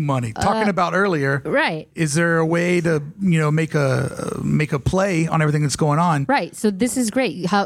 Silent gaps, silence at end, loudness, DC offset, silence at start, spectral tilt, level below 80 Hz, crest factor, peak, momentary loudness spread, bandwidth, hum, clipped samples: none; 0 s; -19 LUFS; under 0.1%; 0 s; -6 dB/octave; -46 dBFS; 14 dB; -4 dBFS; 4 LU; 15 kHz; none; under 0.1%